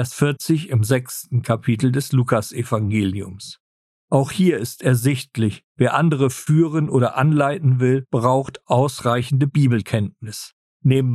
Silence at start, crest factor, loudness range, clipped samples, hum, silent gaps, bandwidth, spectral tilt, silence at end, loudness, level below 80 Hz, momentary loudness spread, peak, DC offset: 0 s; 16 dB; 3 LU; under 0.1%; none; 3.60-4.08 s, 5.64-5.75 s, 10.53-10.80 s; 13.5 kHz; -6.5 dB/octave; 0 s; -20 LUFS; -56 dBFS; 7 LU; -2 dBFS; under 0.1%